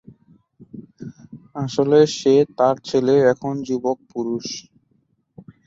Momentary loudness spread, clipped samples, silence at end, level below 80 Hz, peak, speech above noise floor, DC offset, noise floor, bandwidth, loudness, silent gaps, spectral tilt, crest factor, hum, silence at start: 22 LU; under 0.1%; 1.05 s; -62 dBFS; -2 dBFS; 47 dB; under 0.1%; -65 dBFS; 7.8 kHz; -19 LUFS; none; -6 dB/octave; 18 dB; none; 0.6 s